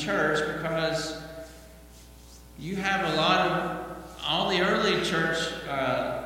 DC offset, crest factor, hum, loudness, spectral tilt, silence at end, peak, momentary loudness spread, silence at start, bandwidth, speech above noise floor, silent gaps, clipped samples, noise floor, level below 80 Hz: under 0.1%; 20 dB; none; -26 LUFS; -4 dB/octave; 0 s; -8 dBFS; 16 LU; 0 s; 17 kHz; 22 dB; none; under 0.1%; -49 dBFS; -52 dBFS